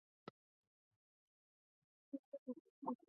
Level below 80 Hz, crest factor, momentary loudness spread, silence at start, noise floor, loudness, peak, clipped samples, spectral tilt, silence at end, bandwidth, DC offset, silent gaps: under -90 dBFS; 24 dB; 12 LU; 0.25 s; under -90 dBFS; -54 LUFS; -32 dBFS; under 0.1%; -4.5 dB/octave; 0.15 s; 2.8 kHz; under 0.1%; 0.30-2.12 s, 2.19-2.32 s, 2.39-2.46 s, 2.60-2.82 s